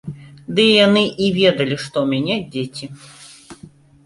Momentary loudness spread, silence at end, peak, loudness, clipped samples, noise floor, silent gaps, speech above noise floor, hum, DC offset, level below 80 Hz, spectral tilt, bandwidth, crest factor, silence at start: 23 LU; 0.35 s; -2 dBFS; -16 LUFS; under 0.1%; -44 dBFS; none; 27 dB; none; under 0.1%; -56 dBFS; -5.5 dB/octave; 11.5 kHz; 18 dB; 0.05 s